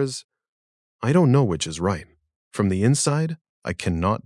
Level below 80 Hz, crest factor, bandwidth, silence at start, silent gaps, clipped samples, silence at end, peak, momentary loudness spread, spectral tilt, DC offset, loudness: -52 dBFS; 18 dB; 12 kHz; 0 s; 0.24-0.29 s, 0.49-0.99 s, 2.36-2.51 s, 3.41-3.62 s; under 0.1%; 0.05 s; -6 dBFS; 14 LU; -5.5 dB/octave; under 0.1%; -22 LUFS